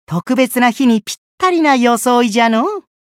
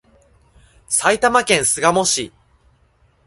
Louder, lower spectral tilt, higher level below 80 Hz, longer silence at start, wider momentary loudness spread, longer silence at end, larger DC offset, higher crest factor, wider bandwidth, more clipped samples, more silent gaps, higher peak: first, -13 LUFS vs -16 LUFS; first, -4.5 dB/octave vs -2 dB/octave; second, -62 dBFS vs -52 dBFS; second, 0.1 s vs 0.9 s; about the same, 6 LU vs 6 LU; second, 0.2 s vs 1 s; neither; second, 12 dB vs 20 dB; first, 16 kHz vs 12 kHz; neither; first, 1.18-1.38 s vs none; about the same, 0 dBFS vs 0 dBFS